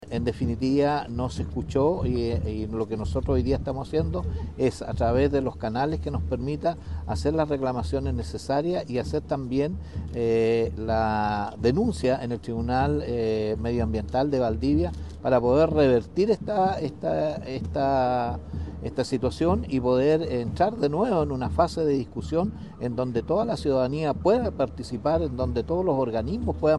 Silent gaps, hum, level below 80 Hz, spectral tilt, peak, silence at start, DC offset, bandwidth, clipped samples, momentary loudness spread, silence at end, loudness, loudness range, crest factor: none; none; -40 dBFS; -7.5 dB/octave; -8 dBFS; 0 s; 0.2%; 11.5 kHz; under 0.1%; 7 LU; 0 s; -26 LUFS; 4 LU; 18 dB